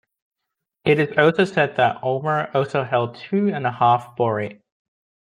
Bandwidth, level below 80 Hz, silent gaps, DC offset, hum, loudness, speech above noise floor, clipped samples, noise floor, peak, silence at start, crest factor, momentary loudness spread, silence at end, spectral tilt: 10.5 kHz; -64 dBFS; none; under 0.1%; none; -20 LUFS; 62 dB; under 0.1%; -82 dBFS; -2 dBFS; 0.85 s; 20 dB; 7 LU; 0.8 s; -7 dB/octave